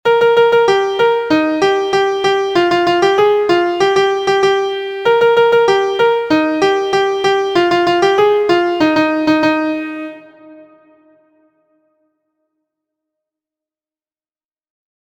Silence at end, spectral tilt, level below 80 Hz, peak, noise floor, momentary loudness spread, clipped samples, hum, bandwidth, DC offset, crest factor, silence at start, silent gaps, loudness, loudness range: 4.45 s; -4.5 dB/octave; -54 dBFS; 0 dBFS; under -90 dBFS; 4 LU; under 0.1%; none; 16 kHz; under 0.1%; 14 dB; 0.05 s; none; -13 LUFS; 6 LU